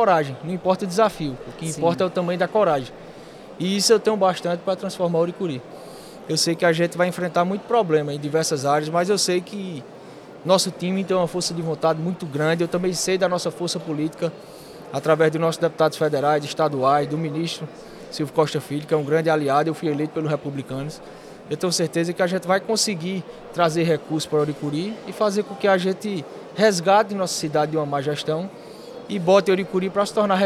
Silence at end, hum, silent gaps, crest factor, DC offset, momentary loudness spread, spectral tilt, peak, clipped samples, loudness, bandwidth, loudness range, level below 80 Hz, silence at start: 0 s; none; none; 18 dB; under 0.1%; 14 LU; -4.5 dB/octave; -4 dBFS; under 0.1%; -22 LUFS; 16 kHz; 2 LU; -60 dBFS; 0 s